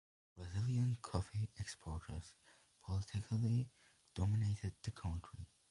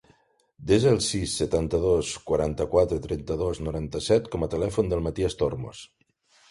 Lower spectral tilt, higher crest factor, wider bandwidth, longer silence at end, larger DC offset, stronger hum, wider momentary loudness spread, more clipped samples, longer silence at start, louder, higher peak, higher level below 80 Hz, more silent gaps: about the same, -6.5 dB/octave vs -5.5 dB/octave; about the same, 20 dB vs 18 dB; about the same, 11.5 kHz vs 11.5 kHz; second, 0.25 s vs 0.65 s; neither; neither; first, 16 LU vs 9 LU; neither; second, 0.35 s vs 0.6 s; second, -42 LUFS vs -25 LUFS; second, -22 dBFS vs -8 dBFS; second, -54 dBFS vs -42 dBFS; neither